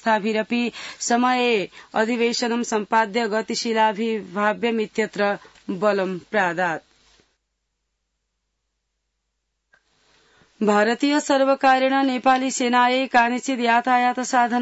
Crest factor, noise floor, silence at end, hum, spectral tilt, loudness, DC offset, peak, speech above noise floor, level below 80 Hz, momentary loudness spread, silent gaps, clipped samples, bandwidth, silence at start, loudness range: 16 dB; -76 dBFS; 0 s; 60 Hz at -65 dBFS; -3.5 dB/octave; -21 LUFS; under 0.1%; -6 dBFS; 56 dB; -68 dBFS; 7 LU; none; under 0.1%; 8 kHz; 0.05 s; 9 LU